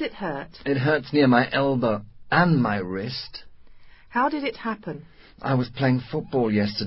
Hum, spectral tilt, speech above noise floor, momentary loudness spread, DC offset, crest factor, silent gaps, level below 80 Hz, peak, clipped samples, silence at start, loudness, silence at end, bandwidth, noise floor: none; -11 dB/octave; 22 dB; 14 LU; under 0.1%; 20 dB; none; -54 dBFS; -4 dBFS; under 0.1%; 0 s; -24 LUFS; 0 s; 5.8 kHz; -45 dBFS